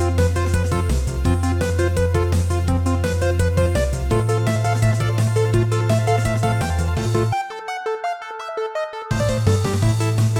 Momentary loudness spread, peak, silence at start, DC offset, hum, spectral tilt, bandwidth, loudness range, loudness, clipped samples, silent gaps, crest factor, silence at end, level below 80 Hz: 7 LU; -6 dBFS; 0 s; under 0.1%; none; -6.5 dB/octave; 15.5 kHz; 3 LU; -20 LUFS; under 0.1%; none; 14 dB; 0 s; -30 dBFS